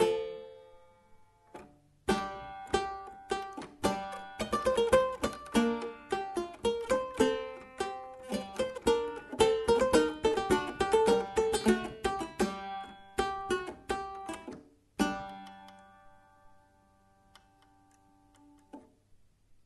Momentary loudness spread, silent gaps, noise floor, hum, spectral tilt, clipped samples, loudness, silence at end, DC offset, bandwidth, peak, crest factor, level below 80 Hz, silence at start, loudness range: 17 LU; none; -65 dBFS; none; -4.5 dB/octave; under 0.1%; -32 LUFS; 0.85 s; under 0.1%; 12 kHz; -10 dBFS; 22 dB; -54 dBFS; 0 s; 11 LU